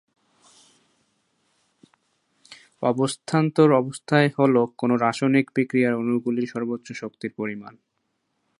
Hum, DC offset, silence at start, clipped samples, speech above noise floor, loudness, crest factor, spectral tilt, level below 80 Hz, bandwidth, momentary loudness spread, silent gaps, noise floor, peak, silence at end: none; under 0.1%; 2.5 s; under 0.1%; 53 dB; -22 LUFS; 22 dB; -6.5 dB/octave; -72 dBFS; 11.5 kHz; 13 LU; none; -74 dBFS; -2 dBFS; 0.9 s